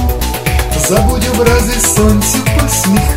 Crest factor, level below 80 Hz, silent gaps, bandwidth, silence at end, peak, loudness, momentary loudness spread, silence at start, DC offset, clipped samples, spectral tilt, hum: 10 dB; -16 dBFS; none; 16.5 kHz; 0 s; 0 dBFS; -11 LUFS; 5 LU; 0 s; under 0.1%; 0.3%; -4.5 dB/octave; none